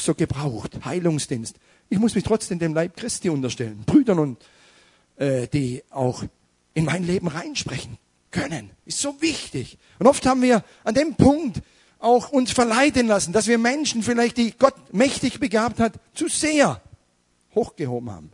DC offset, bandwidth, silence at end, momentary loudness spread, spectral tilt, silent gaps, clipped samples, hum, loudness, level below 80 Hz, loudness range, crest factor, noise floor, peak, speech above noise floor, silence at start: under 0.1%; 11 kHz; 0.05 s; 13 LU; -5 dB/octave; none; under 0.1%; none; -22 LUFS; -50 dBFS; 7 LU; 22 dB; -65 dBFS; 0 dBFS; 43 dB; 0 s